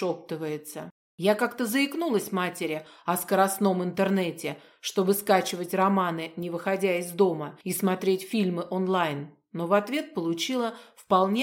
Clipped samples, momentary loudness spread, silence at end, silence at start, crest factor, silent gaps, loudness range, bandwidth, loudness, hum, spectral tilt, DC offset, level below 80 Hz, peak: under 0.1%; 10 LU; 0 s; 0 s; 20 dB; 0.91-1.18 s; 2 LU; 17 kHz; -27 LUFS; none; -5 dB/octave; under 0.1%; -78 dBFS; -8 dBFS